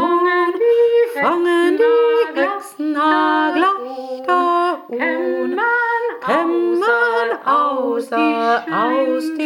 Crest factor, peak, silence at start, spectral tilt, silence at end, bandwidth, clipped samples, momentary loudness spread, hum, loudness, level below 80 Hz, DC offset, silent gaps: 14 dB; -2 dBFS; 0 s; -4.5 dB/octave; 0 s; 16.5 kHz; under 0.1%; 6 LU; none; -17 LUFS; -74 dBFS; under 0.1%; none